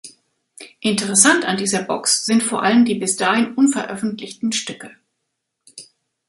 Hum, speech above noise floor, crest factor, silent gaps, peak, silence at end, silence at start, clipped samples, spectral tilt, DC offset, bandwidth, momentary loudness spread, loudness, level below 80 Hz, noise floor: none; 58 dB; 20 dB; none; 0 dBFS; 0.45 s; 0.05 s; under 0.1%; -2.5 dB/octave; under 0.1%; 11.5 kHz; 13 LU; -17 LUFS; -66 dBFS; -76 dBFS